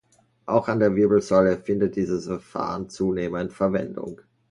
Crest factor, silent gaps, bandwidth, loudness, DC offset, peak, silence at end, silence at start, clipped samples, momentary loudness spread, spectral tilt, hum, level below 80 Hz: 18 dB; none; 11 kHz; -23 LUFS; under 0.1%; -6 dBFS; 0.35 s; 0.45 s; under 0.1%; 13 LU; -7.5 dB/octave; none; -52 dBFS